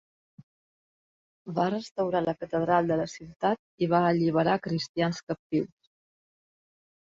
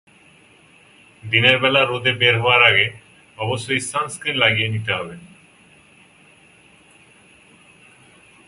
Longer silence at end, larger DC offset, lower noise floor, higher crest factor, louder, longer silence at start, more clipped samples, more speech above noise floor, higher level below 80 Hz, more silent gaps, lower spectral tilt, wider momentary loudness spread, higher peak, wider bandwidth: second, 1.35 s vs 3.2 s; neither; first, under -90 dBFS vs -51 dBFS; about the same, 18 dB vs 22 dB; second, -28 LUFS vs -17 LUFS; first, 1.45 s vs 1.25 s; neither; first, over 63 dB vs 33 dB; second, -64 dBFS vs -58 dBFS; first, 1.91-1.95 s, 3.36-3.40 s, 3.59-3.78 s, 4.89-4.94 s, 5.23-5.27 s, 5.39-5.50 s vs none; first, -6.5 dB/octave vs -3.5 dB/octave; second, 9 LU vs 13 LU; second, -10 dBFS vs 0 dBFS; second, 7.8 kHz vs 11.5 kHz